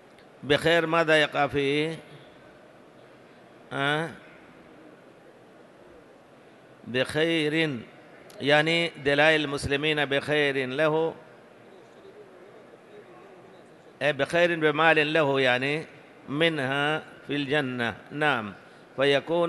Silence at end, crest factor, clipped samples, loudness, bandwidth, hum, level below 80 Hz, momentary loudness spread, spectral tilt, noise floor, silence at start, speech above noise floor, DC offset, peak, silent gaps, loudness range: 0 s; 22 dB; under 0.1%; -25 LUFS; 12.5 kHz; none; -60 dBFS; 11 LU; -5 dB/octave; -53 dBFS; 0.4 s; 28 dB; under 0.1%; -6 dBFS; none; 11 LU